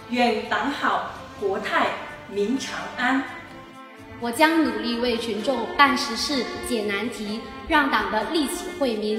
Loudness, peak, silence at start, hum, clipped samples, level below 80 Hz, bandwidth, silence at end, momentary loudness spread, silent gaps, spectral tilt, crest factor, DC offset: -24 LUFS; -2 dBFS; 0 s; none; under 0.1%; -52 dBFS; 16.5 kHz; 0 s; 14 LU; none; -3.5 dB/octave; 22 dB; under 0.1%